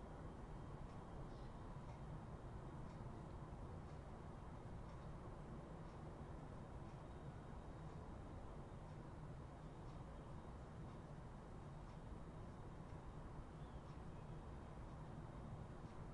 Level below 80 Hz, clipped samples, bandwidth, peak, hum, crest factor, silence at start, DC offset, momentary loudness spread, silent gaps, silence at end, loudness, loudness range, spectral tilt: -60 dBFS; under 0.1%; 11 kHz; -40 dBFS; none; 14 dB; 0 s; under 0.1%; 2 LU; none; 0 s; -56 LUFS; 1 LU; -7.5 dB/octave